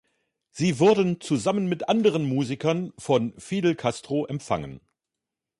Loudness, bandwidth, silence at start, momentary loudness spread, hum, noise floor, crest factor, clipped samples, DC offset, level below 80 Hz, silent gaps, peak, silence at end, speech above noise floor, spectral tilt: -25 LUFS; 11.5 kHz; 0.55 s; 10 LU; none; -87 dBFS; 16 dB; under 0.1%; under 0.1%; -60 dBFS; none; -8 dBFS; 0.85 s; 63 dB; -6 dB/octave